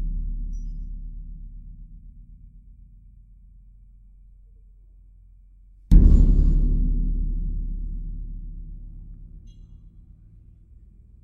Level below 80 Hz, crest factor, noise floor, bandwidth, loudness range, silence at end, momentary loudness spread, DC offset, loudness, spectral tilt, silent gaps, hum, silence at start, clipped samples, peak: -24 dBFS; 22 dB; -50 dBFS; 1.2 kHz; 20 LU; 1.45 s; 28 LU; under 0.1%; -24 LUFS; -10.5 dB/octave; none; none; 0 s; under 0.1%; -2 dBFS